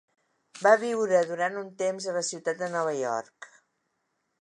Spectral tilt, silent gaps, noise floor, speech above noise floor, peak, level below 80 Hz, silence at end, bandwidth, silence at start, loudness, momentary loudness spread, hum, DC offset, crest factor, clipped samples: -3.5 dB/octave; none; -78 dBFS; 51 dB; -6 dBFS; -84 dBFS; 0.95 s; 11 kHz; 0.55 s; -27 LUFS; 9 LU; none; under 0.1%; 24 dB; under 0.1%